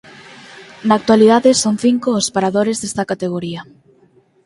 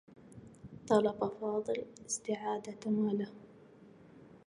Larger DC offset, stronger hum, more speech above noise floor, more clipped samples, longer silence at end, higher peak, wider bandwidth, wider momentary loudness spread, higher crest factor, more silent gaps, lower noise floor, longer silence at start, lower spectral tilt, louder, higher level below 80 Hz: neither; neither; first, 38 dB vs 24 dB; neither; first, 0.85 s vs 0.1 s; first, 0 dBFS vs -14 dBFS; about the same, 11.5 kHz vs 11 kHz; second, 13 LU vs 24 LU; second, 16 dB vs 22 dB; neither; second, -53 dBFS vs -58 dBFS; first, 0.55 s vs 0.1 s; about the same, -4.5 dB/octave vs -5 dB/octave; first, -15 LUFS vs -35 LUFS; first, -56 dBFS vs -72 dBFS